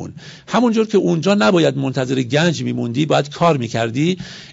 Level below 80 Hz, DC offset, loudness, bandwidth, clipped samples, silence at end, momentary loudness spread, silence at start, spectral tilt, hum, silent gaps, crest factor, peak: -56 dBFS; under 0.1%; -17 LUFS; 8 kHz; under 0.1%; 0 s; 7 LU; 0 s; -6 dB/octave; none; none; 14 dB; -4 dBFS